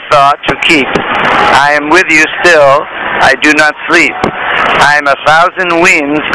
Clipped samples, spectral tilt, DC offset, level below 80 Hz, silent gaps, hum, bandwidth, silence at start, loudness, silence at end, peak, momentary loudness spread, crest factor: 8%; -3 dB/octave; under 0.1%; -38 dBFS; none; none; 11 kHz; 0 s; -6 LUFS; 0 s; 0 dBFS; 5 LU; 8 dB